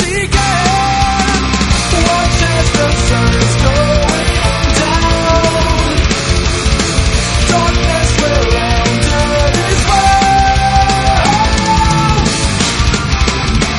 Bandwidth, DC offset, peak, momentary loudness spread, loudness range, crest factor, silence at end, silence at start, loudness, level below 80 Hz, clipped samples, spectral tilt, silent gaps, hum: 11.5 kHz; under 0.1%; 0 dBFS; 3 LU; 1 LU; 10 dB; 0 s; 0 s; -11 LUFS; -16 dBFS; under 0.1%; -4 dB/octave; none; none